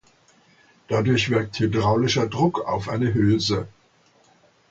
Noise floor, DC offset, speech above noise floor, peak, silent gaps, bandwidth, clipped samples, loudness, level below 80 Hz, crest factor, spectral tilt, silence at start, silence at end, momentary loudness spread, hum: -59 dBFS; under 0.1%; 38 dB; -6 dBFS; none; 7.8 kHz; under 0.1%; -22 LUFS; -48 dBFS; 16 dB; -6 dB/octave; 0.9 s; 1 s; 6 LU; none